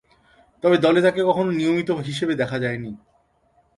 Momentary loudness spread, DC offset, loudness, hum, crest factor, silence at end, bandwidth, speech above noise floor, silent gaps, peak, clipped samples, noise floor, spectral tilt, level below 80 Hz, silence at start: 10 LU; under 0.1%; -21 LUFS; none; 18 dB; 0.8 s; 11.5 kHz; 42 dB; none; -4 dBFS; under 0.1%; -62 dBFS; -6.5 dB/octave; -58 dBFS; 0.65 s